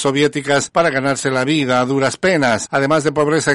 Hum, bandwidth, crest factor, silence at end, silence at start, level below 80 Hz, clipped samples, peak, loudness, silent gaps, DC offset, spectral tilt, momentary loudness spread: none; 11.5 kHz; 12 dB; 0 s; 0 s; -54 dBFS; under 0.1%; -4 dBFS; -16 LUFS; none; 0.2%; -4.5 dB/octave; 2 LU